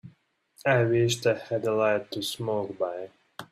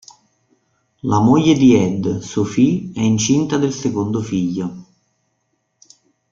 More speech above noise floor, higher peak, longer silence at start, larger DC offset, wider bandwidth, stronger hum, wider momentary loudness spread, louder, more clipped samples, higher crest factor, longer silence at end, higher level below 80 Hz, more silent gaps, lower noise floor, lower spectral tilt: second, 37 dB vs 53 dB; second, -8 dBFS vs -2 dBFS; second, 0.05 s vs 1.05 s; neither; first, 15.5 kHz vs 7.6 kHz; neither; about the same, 11 LU vs 10 LU; second, -27 LUFS vs -17 LUFS; neither; about the same, 20 dB vs 16 dB; second, 0.1 s vs 1.5 s; second, -66 dBFS vs -50 dBFS; neither; second, -63 dBFS vs -69 dBFS; about the same, -5 dB/octave vs -6 dB/octave